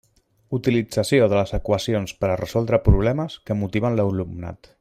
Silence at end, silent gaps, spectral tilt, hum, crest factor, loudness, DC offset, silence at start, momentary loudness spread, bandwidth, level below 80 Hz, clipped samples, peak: 0.25 s; none; -6.5 dB/octave; none; 16 dB; -22 LUFS; under 0.1%; 0.5 s; 10 LU; 15.5 kHz; -32 dBFS; under 0.1%; -4 dBFS